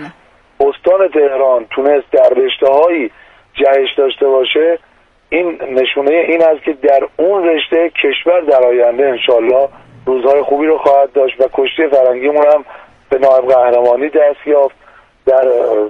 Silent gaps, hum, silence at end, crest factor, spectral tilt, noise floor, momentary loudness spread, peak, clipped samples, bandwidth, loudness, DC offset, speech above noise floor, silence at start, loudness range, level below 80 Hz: none; none; 0 s; 12 dB; -5.5 dB/octave; -46 dBFS; 6 LU; 0 dBFS; under 0.1%; 5 kHz; -11 LUFS; under 0.1%; 35 dB; 0 s; 2 LU; -52 dBFS